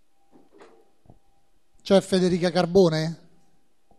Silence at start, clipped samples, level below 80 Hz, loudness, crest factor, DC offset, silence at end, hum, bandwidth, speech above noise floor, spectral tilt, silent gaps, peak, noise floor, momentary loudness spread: 1.85 s; under 0.1%; -58 dBFS; -22 LUFS; 18 dB; 0.2%; 0.85 s; none; 12.5 kHz; 46 dB; -6 dB/octave; none; -6 dBFS; -67 dBFS; 17 LU